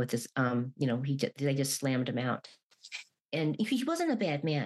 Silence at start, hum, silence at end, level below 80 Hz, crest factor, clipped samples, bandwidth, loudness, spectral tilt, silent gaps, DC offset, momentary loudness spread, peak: 0 s; none; 0 s; -82 dBFS; 16 dB; under 0.1%; 13 kHz; -32 LUFS; -5.5 dB/octave; 2.63-2.70 s, 3.21-3.29 s; under 0.1%; 9 LU; -16 dBFS